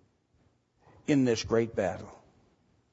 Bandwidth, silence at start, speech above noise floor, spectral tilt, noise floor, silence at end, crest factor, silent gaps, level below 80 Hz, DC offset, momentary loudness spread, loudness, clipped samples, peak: 8 kHz; 1.1 s; 41 dB; -6 dB/octave; -69 dBFS; 0.8 s; 20 dB; none; -60 dBFS; under 0.1%; 16 LU; -29 LUFS; under 0.1%; -12 dBFS